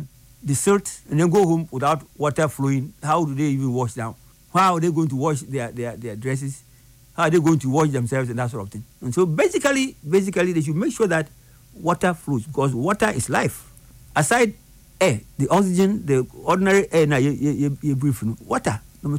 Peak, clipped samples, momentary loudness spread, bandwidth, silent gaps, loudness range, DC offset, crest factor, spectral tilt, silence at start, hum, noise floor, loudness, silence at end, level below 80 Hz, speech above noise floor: -6 dBFS; under 0.1%; 10 LU; 16 kHz; none; 3 LU; under 0.1%; 14 dB; -6 dB/octave; 0 s; none; -50 dBFS; -21 LUFS; 0 s; -52 dBFS; 30 dB